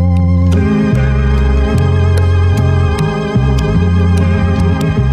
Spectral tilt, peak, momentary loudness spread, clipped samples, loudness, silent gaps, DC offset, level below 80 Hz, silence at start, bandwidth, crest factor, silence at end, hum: -8 dB/octave; -2 dBFS; 2 LU; under 0.1%; -12 LUFS; none; under 0.1%; -18 dBFS; 0 s; 10 kHz; 8 dB; 0 s; none